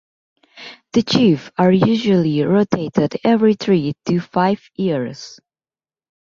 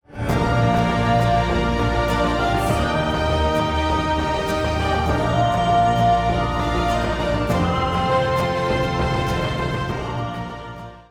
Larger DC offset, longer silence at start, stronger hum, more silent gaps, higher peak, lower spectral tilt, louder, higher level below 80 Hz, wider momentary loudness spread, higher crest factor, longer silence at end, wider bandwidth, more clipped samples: neither; first, 0.55 s vs 0.1 s; neither; neither; first, -2 dBFS vs -6 dBFS; about the same, -7 dB/octave vs -6 dB/octave; first, -17 LUFS vs -20 LUFS; second, -56 dBFS vs -30 dBFS; first, 15 LU vs 6 LU; about the same, 16 dB vs 14 dB; first, 0.9 s vs 0.1 s; second, 7.4 kHz vs 17 kHz; neither